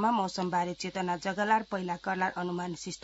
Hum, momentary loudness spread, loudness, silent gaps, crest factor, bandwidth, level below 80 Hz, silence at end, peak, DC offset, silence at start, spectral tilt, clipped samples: none; 7 LU; -31 LUFS; none; 18 dB; 8 kHz; -66 dBFS; 0.05 s; -12 dBFS; under 0.1%; 0 s; -4 dB/octave; under 0.1%